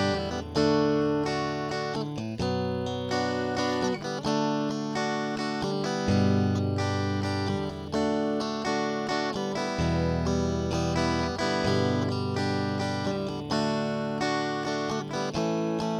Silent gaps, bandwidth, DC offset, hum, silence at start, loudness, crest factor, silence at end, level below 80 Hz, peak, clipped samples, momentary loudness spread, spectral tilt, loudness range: none; 12 kHz; under 0.1%; none; 0 s; -28 LUFS; 16 dB; 0 s; -48 dBFS; -12 dBFS; under 0.1%; 5 LU; -6 dB/octave; 2 LU